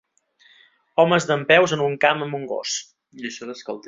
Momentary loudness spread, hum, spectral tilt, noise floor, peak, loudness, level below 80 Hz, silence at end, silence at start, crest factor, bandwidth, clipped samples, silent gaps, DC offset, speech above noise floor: 17 LU; none; -4 dB/octave; -58 dBFS; -2 dBFS; -20 LUFS; -64 dBFS; 0.1 s; 0.95 s; 20 dB; 7.8 kHz; under 0.1%; none; under 0.1%; 37 dB